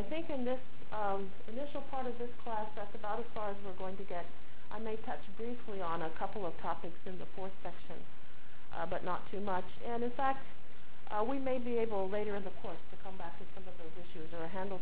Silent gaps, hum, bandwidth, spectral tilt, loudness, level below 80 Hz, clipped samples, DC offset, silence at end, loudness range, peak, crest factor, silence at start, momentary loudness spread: none; none; 4 kHz; -9 dB/octave; -41 LUFS; -62 dBFS; under 0.1%; 4%; 0 s; 5 LU; -20 dBFS; 20 dB; 0 s; 15 LU